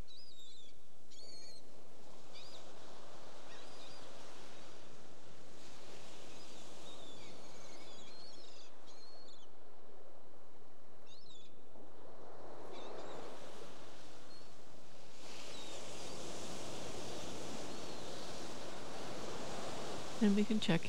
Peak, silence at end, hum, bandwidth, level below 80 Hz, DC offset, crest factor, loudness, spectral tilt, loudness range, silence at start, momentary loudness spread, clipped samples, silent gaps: -20 dBFS; 0 s; none; 16 kHz; -72 dBFS; 2%; 26 dB; -46 LUFS; -4.5 dB/octave; 12 LU; 0 s; 15 LU; under 0.1%; none